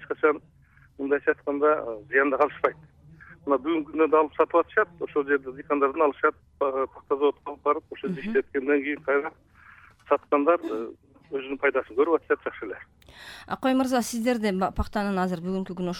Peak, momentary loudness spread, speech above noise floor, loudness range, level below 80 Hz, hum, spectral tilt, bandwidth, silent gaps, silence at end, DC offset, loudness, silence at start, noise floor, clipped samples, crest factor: -8 dBFS; 12 LU; 27 dB; 3 LU; -50 dBFS; none; -5.5 dB/octave; 16 kHz; none; 0 s; under 0.1%; -26 LUFS; 0 s; -53 dBFS; under 0.1%; 18 dB